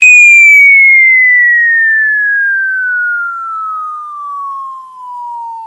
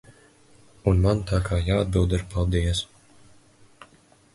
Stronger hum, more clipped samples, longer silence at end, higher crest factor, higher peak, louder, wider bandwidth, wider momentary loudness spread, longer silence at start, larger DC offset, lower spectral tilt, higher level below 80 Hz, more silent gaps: neither; first, 0.7% vs under 0.1%; second, 0 s vs 1.5 s; second, 8 dB vs 20 dB; first, 0 dBFS vs -6 dBFS; first, -4 LUFS vs -24 LUFS; about the same, 12.5 kHz vs 11.5 kHz; first, 22 LU vs 6 LU; second, 0 s vs 0.85 s; neither; second, 4 dB/octave vs -6.5 dB/octave; second, -78 dBFS vs -32 dBFS; neither